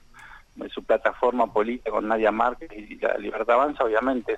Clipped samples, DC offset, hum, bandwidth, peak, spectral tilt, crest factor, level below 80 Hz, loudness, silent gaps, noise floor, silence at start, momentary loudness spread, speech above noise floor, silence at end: under 0.1%; under 0.1%; none; 9 kHz; -8 dBFS; -6 dB/octave; 18 dB; -52 dBFS; -24 LUFS; none; -48 dBFS; 0.15 s; 15 LU; 24 dB; 0 s